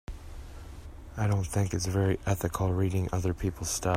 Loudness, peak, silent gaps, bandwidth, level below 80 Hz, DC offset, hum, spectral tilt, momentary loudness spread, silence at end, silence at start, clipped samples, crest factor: -30 LUFS; -12 dBFS; none; 16 kHz; -44 dBFS; under 0.1%; none; -5.5 dB/octave; 18 LU; 0 s; 0.1 s; under 0.1%; 16 dB